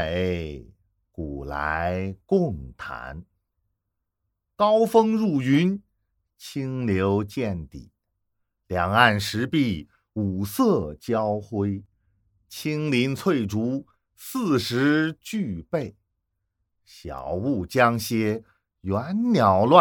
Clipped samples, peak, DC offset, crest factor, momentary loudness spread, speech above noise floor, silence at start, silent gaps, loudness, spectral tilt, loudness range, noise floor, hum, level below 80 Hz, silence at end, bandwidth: under 0.1%; 0 dBFS; under 0.1%; 24 dB; 17 LU; 57 dB; 0 s; none; -24 LUFS; -6 dB/octave; 5 LU; -80 dBFS; none; -50 dBFS; 0 s; 19 kHz